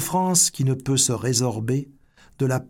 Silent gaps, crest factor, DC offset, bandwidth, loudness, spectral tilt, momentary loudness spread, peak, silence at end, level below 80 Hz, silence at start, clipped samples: none; 18 dB; under 0.1%; 17 kHz; -21 LUFS; -4 dB/octave; 9 LU; -4 dBFS; 0 s; -54 dBFS; 0 s; under 0.1%